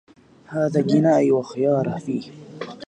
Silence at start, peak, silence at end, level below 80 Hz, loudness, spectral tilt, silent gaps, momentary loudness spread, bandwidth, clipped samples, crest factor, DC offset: 0.5 s; -6 dBFS; 0.05 s; -64 dBFS; -21 LUFS; -8 dB/octave; none; 18 LU; 9.2 kHz; under 0.1%; 16 dB; under 0.1%